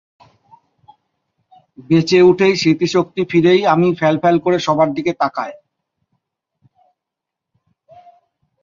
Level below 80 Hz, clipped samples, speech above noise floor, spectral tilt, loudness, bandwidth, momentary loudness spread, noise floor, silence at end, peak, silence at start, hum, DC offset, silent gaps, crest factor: -58 dBFS; under 0.1%; 68 dB; -6 dB/octave; -15 LUFS; 7.4 kHz; 8 LU; -82 dBFS; 3.1 s; -2 dBFS; 1.8 s; none; under 0.1%; none; 16 dB